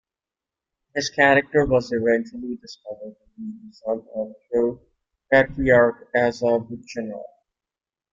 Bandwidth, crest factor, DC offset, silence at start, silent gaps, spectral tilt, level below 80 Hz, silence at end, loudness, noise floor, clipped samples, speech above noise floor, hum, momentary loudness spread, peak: 7.6 kHz; 20 dB; under 0.1%; 0.95 s; none; -5.5 dB/octave; -48 dBFS; 0.85 s; -21 LUFS; under -90 dBFS; under 0.1%; over 68 dB; none; 20 LU; -2 dBFS